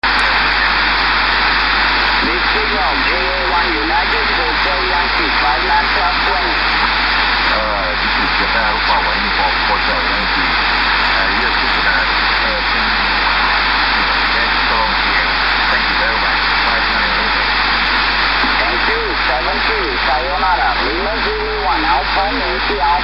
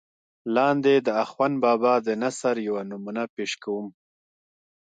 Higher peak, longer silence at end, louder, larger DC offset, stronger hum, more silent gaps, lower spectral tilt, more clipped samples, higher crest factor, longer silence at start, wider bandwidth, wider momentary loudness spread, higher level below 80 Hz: first, 0 dBFS vs -10 dBFS; second, 0 s vs 1 s; first, -13 LUFS vs -24 LUFS; first, 1% vs under 0.1%; neither; second, none vs 3.29-3.37 s; about the same, -4.5 dB/octave vs -5 dB/octave; neither; about the same, 14 dB vs 16 dB; second, 0 s vs 0.45 s; first, 10.5 kHz vs 9.4 kHz; second, 3 LU vs 11 LU; first, -28 dBFS vs -76 dBFS